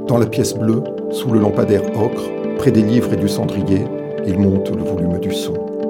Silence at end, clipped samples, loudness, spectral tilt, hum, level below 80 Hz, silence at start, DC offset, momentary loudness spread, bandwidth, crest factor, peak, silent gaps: 0 s; under 0.1%; -17 LUFS; -7 dB/octave; none; -48 dBFS; 0 s; under 0.1%; 8 LU; 17 kHz; 16 dB; 0 dBFS; none